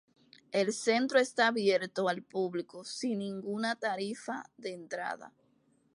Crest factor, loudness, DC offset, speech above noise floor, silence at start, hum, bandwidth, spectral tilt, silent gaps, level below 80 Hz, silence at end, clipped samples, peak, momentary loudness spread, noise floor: 20 dB; -32 LUFS; under 0.1%; 38 dB; 0.5 s; none; 11.5 kHz; -4 dB/octave; none; -84 dBFS; 0.65 s; under 0.1%; -14 dBFS; 13 LU; -70 dBFS